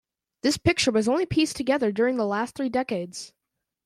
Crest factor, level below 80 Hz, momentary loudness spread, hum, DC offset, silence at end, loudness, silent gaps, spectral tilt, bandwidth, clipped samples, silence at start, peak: 18 dB; -52 dBFS; 9 LU; none; under 0.1%; 0.55 s; -24 LUFS; none; -4.5 dB/octave; 15 kHz; under 0.1%; 0.45 s; -8 dBFS